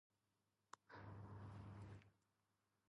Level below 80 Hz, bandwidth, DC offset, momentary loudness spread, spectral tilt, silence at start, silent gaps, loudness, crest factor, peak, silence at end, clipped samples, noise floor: -76 dBFS; 10.5 kHz; under 0.1%; 8 LU; -6.5 dB/octave; 0.75 s; none; -60 LUFS; 20 dB; -42 dBFS; 0.75 s; under 0.1%; -89 dBFS